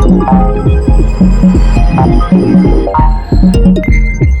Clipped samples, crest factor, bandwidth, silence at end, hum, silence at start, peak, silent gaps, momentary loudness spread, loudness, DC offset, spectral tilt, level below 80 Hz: under 0.1%; 6 dB; 9 kHz; 0 s; none; 0 s; 0 dBFS; none; 4 LU; -9 LUFS; under 0.1%; -8.5 dB/octave; -10 dBFS